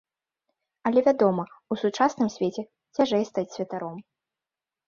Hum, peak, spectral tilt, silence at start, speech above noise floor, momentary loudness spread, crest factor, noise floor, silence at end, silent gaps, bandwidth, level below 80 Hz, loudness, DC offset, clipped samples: none; -8 dBFS; -6 dB/octave; 0.85 s; over 65 dB; 13 LU; 20 dB; under -90 dBFS; 0.85 s; none; 7.6 kHz; -70 dBFS; -26 LUFS; under 0.1%; under 0.1%